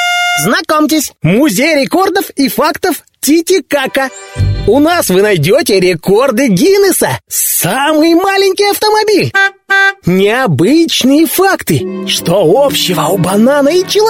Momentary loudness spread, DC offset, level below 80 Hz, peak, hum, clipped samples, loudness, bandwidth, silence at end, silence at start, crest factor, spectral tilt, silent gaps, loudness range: 5 LU; under 0.1%; -34 dBFS; 0 dBFS; none; under 0.1%; -10 LUFS; 16.5 kHz; 0 s; 0 s; 10 dB; -4 dB/octave; none; 2 LU